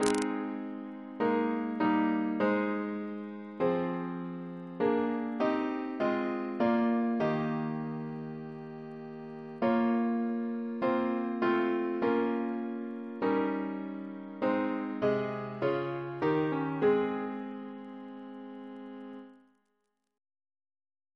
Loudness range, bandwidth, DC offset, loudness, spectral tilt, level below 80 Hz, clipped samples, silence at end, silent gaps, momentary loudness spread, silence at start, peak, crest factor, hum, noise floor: 3 LU; 11 kHz; under 0.1%; -32 LUFS; -6.5 dB/octave; -72 dBFS; under 0.1%; 1.8 s; none; 15 LU; 0 s; -8 dBFS; 24 dB; none; -81 dBFS